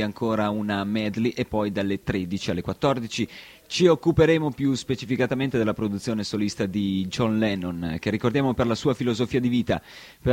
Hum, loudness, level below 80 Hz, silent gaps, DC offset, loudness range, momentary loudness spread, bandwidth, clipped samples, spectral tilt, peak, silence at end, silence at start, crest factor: none; -25 LUFS; -48 dBFS; none; under 0.1%; 3 LU; 8 LU; 16.5 kHz; under 0.1%; -6 dB/octave; -6 dBFS; 0 s; 0 s; 18 dB